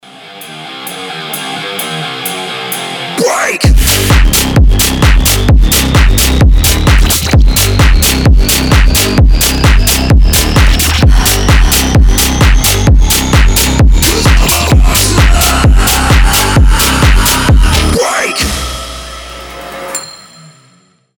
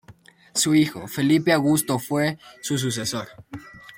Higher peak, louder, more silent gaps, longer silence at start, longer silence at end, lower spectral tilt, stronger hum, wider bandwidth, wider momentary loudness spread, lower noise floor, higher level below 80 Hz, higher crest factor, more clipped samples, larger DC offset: first, 0 dBFS vs -4 dBFS; first, -8 LUFS vs -22 LUFS; neither; about the same, 0.2 s vs 0.1 s; first, 1 s vs 0.05 s; about the same, -3.5 dB/octave vs -4.5 dB/octave; neither; first, over 20 kHz vs 17 kHz; second, 12 LU vs 18 LU; about the same, -48 dBFS vs -50 dBFS; first, -10 dBFS vs -60 dBFS; second, 8 dB vs 18 dB; neither; neither